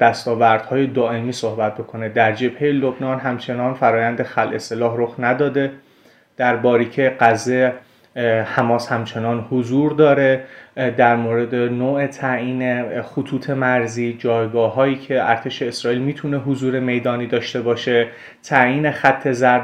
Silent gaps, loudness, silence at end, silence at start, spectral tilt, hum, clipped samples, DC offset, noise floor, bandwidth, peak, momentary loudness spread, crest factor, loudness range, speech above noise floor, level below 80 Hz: none; -18 LUFS; 0 s; 0 s; -6 dB/octave; none; under 0.1%; under 0.1%; -52 dBFS; 11.5 kHz; 0 dBFS; 8 LU; 18 dB; 3 LU; 34 dB; -62 dBFS